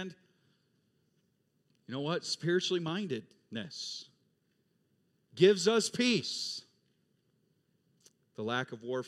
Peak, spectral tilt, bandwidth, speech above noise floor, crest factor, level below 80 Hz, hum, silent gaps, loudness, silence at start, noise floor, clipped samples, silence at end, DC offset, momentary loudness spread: -10 dBFS; -4 dB/octave; 13.5 kHz; 44 dB; 26 dB; -88 dBFS; none; none; -32 LUFS; 0 s; -76 dBFS; under 0.1%; 0 s; under 0.1%; 17 LU